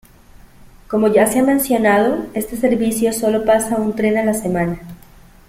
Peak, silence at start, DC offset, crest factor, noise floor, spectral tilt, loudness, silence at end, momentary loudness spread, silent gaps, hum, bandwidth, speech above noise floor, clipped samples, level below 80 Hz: -2 dBFS; 0.9 s; under 0.1%; 16 dB; -44 dBFS; -5 dB/octave; -16 LUFS; 0.5 s; 9 LU; none; none; 16.5 kHz; 28 dB; under 0.1%; -44 dBFS